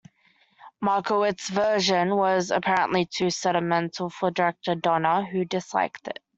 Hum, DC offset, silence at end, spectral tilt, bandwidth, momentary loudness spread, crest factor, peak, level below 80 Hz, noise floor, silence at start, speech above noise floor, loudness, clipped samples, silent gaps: none; under 0.1%; 0.25 s; -4.5 dB/octave; 8.2 kHz; 6 LU; 18 dB; -8 dBFS; -66 dBFS; -63 dBFS; 0.6 s; 39 dB; -24 LUFS; under 0.1%; none